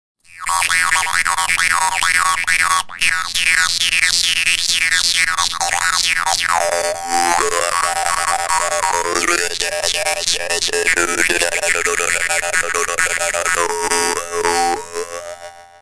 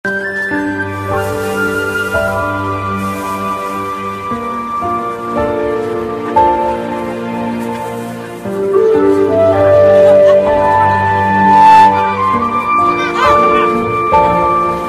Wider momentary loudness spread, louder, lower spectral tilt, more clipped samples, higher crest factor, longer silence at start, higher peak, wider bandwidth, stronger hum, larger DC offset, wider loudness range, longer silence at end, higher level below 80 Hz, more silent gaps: second, 5 LU vs 13 LU; second, -15 LUFS vs -12 LUFS; second, 0.5 dB/octave vs -6 dB/octave; neither; first, 18 dB vs 12 dB; first, 0.3 s vs 0.05 s; about the same, 0 dBFS vs 0 dBFS; second, 11 kHz vs 14.5 kHz; neither; neither; second, 3 LU vs 9 LU; first, 0.15 s vs 0 s; about the same, -44 dBFS vs -40 dBFS; neither